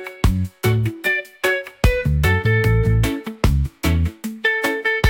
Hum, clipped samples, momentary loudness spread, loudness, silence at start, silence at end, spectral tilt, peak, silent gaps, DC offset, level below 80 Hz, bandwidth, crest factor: none; under 0.1%; 5 LU; -19 LUFS; 0 s; 0 s; -6 dB/octave; -4 dBFS; none; under 0.1%; -26 dBFS; 17 kHz; 14 dB